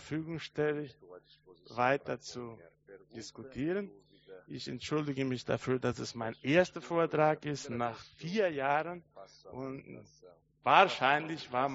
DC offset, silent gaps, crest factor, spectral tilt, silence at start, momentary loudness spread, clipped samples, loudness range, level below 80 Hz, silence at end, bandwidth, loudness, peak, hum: under 0.1%; none; 26 dB; -3.5 dB/octave; 0 s; 19 LU; under 0.1%; 7 LU; -68 dBFS; 0 s; 8 kHz; -33 LUFS; -8 dBFS; none